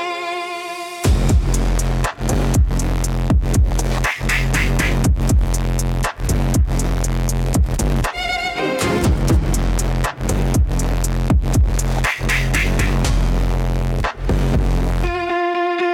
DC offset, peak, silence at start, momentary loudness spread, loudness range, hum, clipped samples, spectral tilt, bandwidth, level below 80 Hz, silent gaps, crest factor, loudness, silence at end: under 0.1%; -4 dBFS; 0 s; 4 LU; 1 LU; none; under 0.1%; -5 dB/octave; 16.5 kHz; -20 dBFS; none; 12 dB; -19 LUFS; 0 s